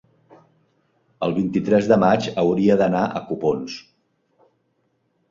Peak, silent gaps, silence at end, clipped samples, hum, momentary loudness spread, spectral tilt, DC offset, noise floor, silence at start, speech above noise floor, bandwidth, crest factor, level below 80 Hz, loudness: -2 dBFS; none; 1.5 s; under 0.1%; none; 11 LU; -7 dB/octave; under 0.1%; -68 dBFS; 1.2 s; 49 dB; 7.6 kHz; 20 dB; -56 dBFS; -20 LUFS